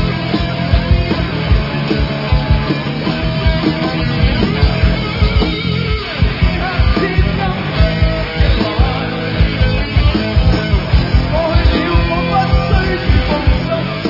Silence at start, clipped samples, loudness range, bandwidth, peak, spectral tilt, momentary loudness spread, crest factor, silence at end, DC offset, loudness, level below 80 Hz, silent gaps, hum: 0 s; under 0.1%; 2 LU; 5.8 kHz; 0 dBFS; -8 dB/octave; 3 LU; 14 dB; 0 s; under 0.1%; -15 LUFS; -18 dBFS; none; none